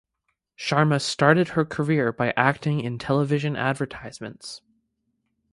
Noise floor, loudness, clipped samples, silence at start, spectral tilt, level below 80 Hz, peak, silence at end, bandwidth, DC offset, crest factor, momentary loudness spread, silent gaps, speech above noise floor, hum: -77 dBFS; -23 LUFS; under 0.1%; 0.6 s; -6 dB/octave; -58 dBFS; -2 dBFS; 0.95 s; 11.5 kHz; under 0.1%; 22 dB; 17 LU; none; 54 dB; none